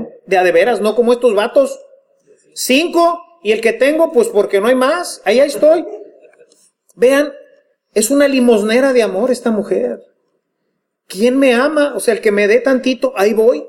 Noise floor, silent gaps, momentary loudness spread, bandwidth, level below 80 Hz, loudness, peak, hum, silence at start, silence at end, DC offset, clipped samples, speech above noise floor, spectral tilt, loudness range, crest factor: -70 dBFS; none; 8 LU; 17 kHz; -58 dBFS; -13 LUFS; 0 dBFS; none; 0 s; 0 s; under 0.1%; under 0.1%; 58 dB; -3.5 dB/octave; 2 LU; 14 dB